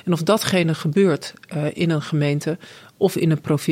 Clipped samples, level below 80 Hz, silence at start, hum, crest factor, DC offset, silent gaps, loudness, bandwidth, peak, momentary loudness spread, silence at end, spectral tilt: under 0.1%; -62 dBFS; 0.05 s; none; 18 dB; under 0.1%; none; -21 LUFS; 16 kHz; -4 dBFS; 8 LU; 0 s; -6 dB/octave